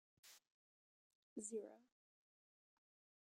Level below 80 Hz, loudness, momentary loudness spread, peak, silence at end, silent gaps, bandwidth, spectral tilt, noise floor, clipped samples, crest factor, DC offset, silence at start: under -90 dBFS; -52 LUFS; 16 LU; -34 dBFS; 1.45 s; 0.47-1.36 s; 13.5 kHz; -3.5 dB/octave; under -90 dBFS; under 0.1%; 24 dB; under 0.1%; 0.25 s